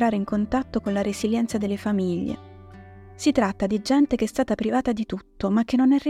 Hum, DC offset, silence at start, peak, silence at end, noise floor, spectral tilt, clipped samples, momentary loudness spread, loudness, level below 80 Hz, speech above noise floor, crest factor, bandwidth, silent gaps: none; under 0.1%; 0 s; -6 dBFS; 0 s; -44 dBFS; -6 dB/octave; under 0.1%; 8 LU; -24 LUFS; -48 dBFS; 21 dB; 16 dB; 14 kHz; none